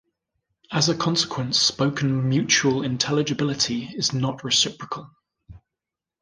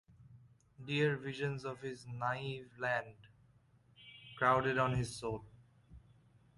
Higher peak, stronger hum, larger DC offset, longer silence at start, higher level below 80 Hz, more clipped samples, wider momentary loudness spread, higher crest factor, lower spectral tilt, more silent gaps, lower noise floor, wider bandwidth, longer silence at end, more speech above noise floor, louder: first, -4 dBFS vs -14 dBFS; neither; neither; first, 0.7 s vs 0.2 s; first, -58 dBFS vs -64 dBFS; neither; second, 7 LU vs 22 LU; about the same, 20 dB vs 24 dB; second, -3.5 dB/octave vs -5.5 dB/octave; neither; first, -87 dBFS vs -68 dBFS; about the same, 10.5 kHz vs 11.5 kHz; about the same, 0.65 s vs 0.6 s; first, 64 dB vs 31 dB; first, -22 LUFS vs -37 LUFS